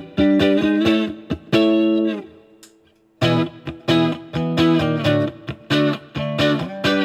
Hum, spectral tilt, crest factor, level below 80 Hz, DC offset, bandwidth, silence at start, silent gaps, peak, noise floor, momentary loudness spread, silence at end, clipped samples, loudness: none; -6.5 dB/octave; 16 dB; -50 dBFS; under 0.1%; 13 kHz; 0 s; none; -2 dBFS; -56 dBFS; 10 LU; 0 s; under 0.1%; -19 LUFS